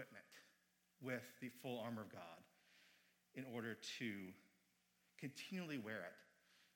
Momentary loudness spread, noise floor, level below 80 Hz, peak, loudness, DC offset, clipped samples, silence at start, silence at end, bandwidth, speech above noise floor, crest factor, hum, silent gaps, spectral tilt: 15 LU; -81 dBFS; under -90 dBFS; -32 dBFS; -51 LUFS; under 0.1%; under 0.1%; 0 s; 0.1 s; 17 kHz; 31 dB; 20 dB; none; none; -5 dB/octave